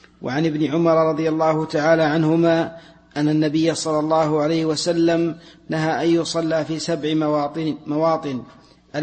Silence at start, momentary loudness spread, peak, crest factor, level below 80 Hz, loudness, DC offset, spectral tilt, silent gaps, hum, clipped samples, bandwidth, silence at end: 0.2 s; 9 LU; -4 dBFS; 16 dB; -58 dBFS; -20 LUFS; under 0.1%; -6 dB/octave; none; none; under 0.1%; 8.8 kHz; 0 s